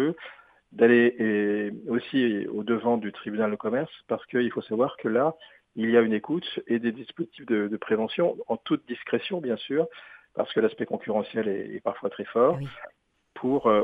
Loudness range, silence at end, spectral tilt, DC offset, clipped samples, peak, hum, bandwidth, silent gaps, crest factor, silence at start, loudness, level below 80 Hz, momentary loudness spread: 4 LU; 0 s; -8.5 dB/octave; under 0.1%; under 0.1%; -6 dBFS; none; 4.9 kHz; none; 20 dB; 0 s; -27 LUFS; -70 dBFS; 11 LU